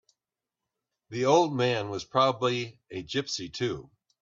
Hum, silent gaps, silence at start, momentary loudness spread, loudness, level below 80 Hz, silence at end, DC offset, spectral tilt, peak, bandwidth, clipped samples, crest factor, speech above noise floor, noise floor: none; none; 1.1 s; 15 LU; -28 LUFS; -66 dBFS; 0.35 s; under 0.1%; -5 dB/octave; -8 dBFS; 7.6 kHz; under 0.1%; 20 dB; 62 dB; -89 dBFS